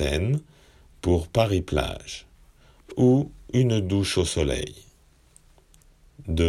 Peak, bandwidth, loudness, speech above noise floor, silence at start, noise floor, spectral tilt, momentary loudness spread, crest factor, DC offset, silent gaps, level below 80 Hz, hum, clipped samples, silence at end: -6 dBFS; 14 kHz; -24 LUFS; 34 dB; 0 s; -57 dBFS; -6 dB/octave; 16 LU; 20 dB; under 0.1%; none; -38 dBFS; none; under 0.1%; 0 s